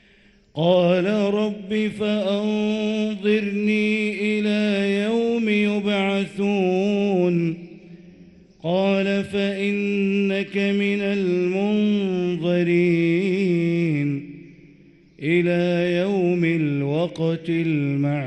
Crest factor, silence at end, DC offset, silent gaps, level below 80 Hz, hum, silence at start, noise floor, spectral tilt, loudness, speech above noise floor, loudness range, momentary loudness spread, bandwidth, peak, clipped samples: 16 dB; 0 s; under 0.1%; none; -60 dBFS; none; 0.55 s; -55 dBFS; -7.5 dB/octave; -21 LUFS; 34 dB; 2 LU; 5 LU; 9 kHz; -6 dBFS; under 0.1%